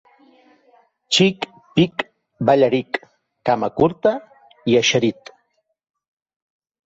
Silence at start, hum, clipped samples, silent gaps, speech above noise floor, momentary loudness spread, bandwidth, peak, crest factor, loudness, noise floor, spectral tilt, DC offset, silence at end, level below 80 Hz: 1.1 s; none; under 0.1%; none; 52 dB; 13 LU; 8.2 kHz; -2 dBFS; 18 dB; -19 LUFS; -69 dBFS; -4.5 dB/octave; under 0.1%; 1.75 s; -56 dBFS